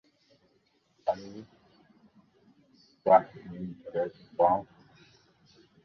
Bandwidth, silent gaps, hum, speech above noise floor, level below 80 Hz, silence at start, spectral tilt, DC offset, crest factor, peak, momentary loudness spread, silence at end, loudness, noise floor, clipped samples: 6.4 kHz; none; none; 42 dB; -68 dBFS; 1.05 s; -7.5 dB/octave; under 0.1%; 24 dB; -8 dBFS; 19 LU; 1.2 s; -29 LUFS; -70 dBFS; under 0.1%